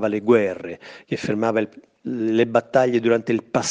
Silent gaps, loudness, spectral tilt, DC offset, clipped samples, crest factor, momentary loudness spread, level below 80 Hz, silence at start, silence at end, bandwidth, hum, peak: none; -21 LUFS; -5.5 dB/octave; under 0.1%; under 0.1%; 18 dB; 14 LU; -66 dBFS; 0 s; 0 s; 9 kHz; none; -2 dBFS